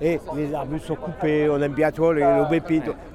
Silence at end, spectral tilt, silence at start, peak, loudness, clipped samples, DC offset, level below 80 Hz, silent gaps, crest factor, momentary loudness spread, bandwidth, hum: 0 s; -8 dB/octave; 0 s; -6 dBFS; -22 LUFS; under 0.1%; under 0.1%; -44 dBFS; none; 16 dB; 10 LU; 13.5 kHz; none